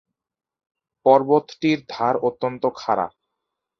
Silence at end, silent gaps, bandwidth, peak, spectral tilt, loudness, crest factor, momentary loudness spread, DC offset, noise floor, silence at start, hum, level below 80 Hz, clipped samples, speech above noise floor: 0.7 s; none; 6.6 kHz; -2 dBFS; -6.5 dB/octave; -21 LUFS; 20 dB; 8 LU; under 0.1%; -81 dBFS; 1.05 s; none; -66 dBFS; under 0.1%; 61 dB